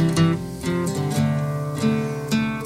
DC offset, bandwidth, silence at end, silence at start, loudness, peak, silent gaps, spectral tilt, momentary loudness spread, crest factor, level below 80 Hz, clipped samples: under 0.1%; 16 kHz; 0 s; 0 s; -23 LUFS; -8 dBFS; none; -6.5 dB/octave; 5 LU; 14 dB; -48 dBFS; under 0.1%